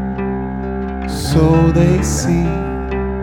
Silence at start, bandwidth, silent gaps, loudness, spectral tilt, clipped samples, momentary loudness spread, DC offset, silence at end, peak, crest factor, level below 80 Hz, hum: 0 s; 17 kHz; none; -16 LUFS; -6.5 dB/octave; under 0.1%; 11 LU; under 0.1%; 0 s; -2 dBFS; 14 dB; -24 dBFS; none